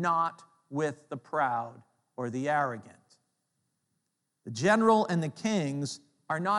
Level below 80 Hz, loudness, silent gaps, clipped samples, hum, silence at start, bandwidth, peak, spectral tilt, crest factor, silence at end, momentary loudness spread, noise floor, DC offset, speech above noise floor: -82 dBFS; -30 LUFS; none; under 0.1%; none; 0 s; 11.5 kHz; -12 dBFS; -5.5 dB/octave; 20 dB; 0 s; 19 LU; -81 dBFS; under 0.1%; 52 dB